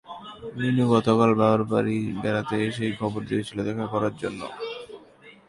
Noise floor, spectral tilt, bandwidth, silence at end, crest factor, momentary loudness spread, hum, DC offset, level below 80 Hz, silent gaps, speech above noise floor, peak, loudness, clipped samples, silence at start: -51 dBFS; -7 dB/octave; 11.5 kHz; 0.15 s; 18 dB; 16 LU; none; under 0.1%; -58 dBFS; none; 27 dB; -6 dBFS; -25 LUFS; under 0.1%; 0.05 s